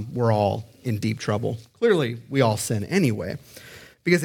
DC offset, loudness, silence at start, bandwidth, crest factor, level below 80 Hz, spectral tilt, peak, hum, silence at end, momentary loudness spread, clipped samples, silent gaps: under 0.1%; -24 LUFS; 0 s; 17.5 kHz; 20 dB; -60 dBFS; -6 dB/octave; -4 dBFS; none; 0 s; 13 LU; under 0.1%; none